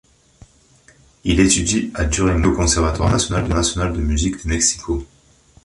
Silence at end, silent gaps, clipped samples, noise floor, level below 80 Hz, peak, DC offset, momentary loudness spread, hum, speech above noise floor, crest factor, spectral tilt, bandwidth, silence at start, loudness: 0.6 s; none; under 0.1%; -52 dBFS; -26 dBFS; -2 dBFS; under 0.1%; 7 LU; none; 34 dB; 16 dB; -4 dB/octave; 11.5 kHz; 1.25 s; -18 LUFS